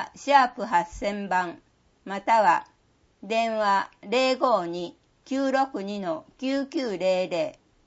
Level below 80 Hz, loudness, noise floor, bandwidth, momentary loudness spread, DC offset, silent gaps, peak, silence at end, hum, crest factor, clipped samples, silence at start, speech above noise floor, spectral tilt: -58 dBFS; -25 LUFS; -64 dBFS; 8 kHz; 12 LU; under 0.1%; none; -6 dBFS; 0.35 s; none; 20 dB; under 0.1%; 0 s; 39 dB; -4.5 dB/octave